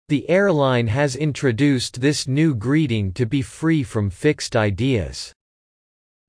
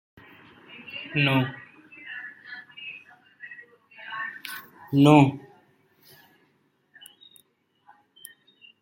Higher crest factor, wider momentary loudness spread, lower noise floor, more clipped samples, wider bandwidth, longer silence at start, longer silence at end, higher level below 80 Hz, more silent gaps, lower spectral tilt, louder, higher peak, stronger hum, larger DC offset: second, 14 dB vs 26 dB; second, 5 LU vs 29 LU; first, under -90 dBFS vs -68 dBFS; neither; second, 10.5 kHz vs 16.5 kHz; second, 0.1 s vs 0.9 s; second, 1 s vs 3.45 s; first, -46 dBFS vs -66 dBFS; neither; about the same, -6 dB/octave vs -7 dB/octave; first, -20 LUFS vs -23 LUFS; second, -6 dBFS vs -2 dBFS; neither; neither